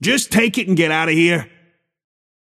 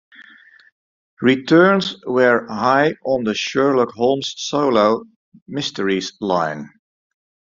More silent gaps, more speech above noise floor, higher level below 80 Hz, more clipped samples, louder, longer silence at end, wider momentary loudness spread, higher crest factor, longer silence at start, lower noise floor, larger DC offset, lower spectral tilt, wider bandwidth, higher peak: second, none vs 0.72-1.17 s, 5.16-5.32 s, 5.42-5.46 s; first, 41 dB vs 30 dB; first, -54 dBFS vs -60 dBFS; neither; about the same, -16 LUFS vs -18 LUFS; first, 1.05 s vs 0.9 s; second, 2 LU vs 10 LU; about the same, 16 dB vs 18 dB; second, 0 s vs 0.2 s; first, -57 dBFS vs -47 dBFS; neither; about the same, -4 dB/octave vs -5 dB/octave; first, 15.5 kHz vs 7.6 kHz; about the same, -2 dBFS vs -2 dBFS